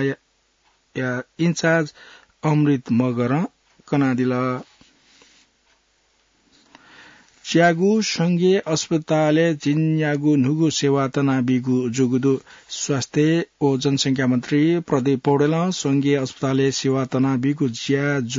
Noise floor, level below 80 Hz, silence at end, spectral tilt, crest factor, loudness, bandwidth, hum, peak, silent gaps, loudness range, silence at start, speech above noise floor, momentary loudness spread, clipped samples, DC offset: -64 dBFS; -64 dBFS; 0 s; -5.5 dB/octave; 16 dB; -20 LUFS; 7.8 kHz; none; -6 dBFS; none; 6 LU; 0 s; 44 dB; 8 LU; under 0.1%; under 0.1%